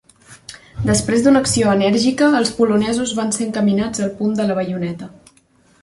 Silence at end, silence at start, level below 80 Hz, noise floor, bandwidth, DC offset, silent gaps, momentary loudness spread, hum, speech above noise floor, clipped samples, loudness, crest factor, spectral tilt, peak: 0.75 s; 0.3 s; -44 dBFS; -55 dBFS; 11.5 kHz; under 0.1%; none; 14 LU; none; 38 dB; under 0.1%; -17 LUFS; 14 dB; -4.5 dB/octave; -2 dBFS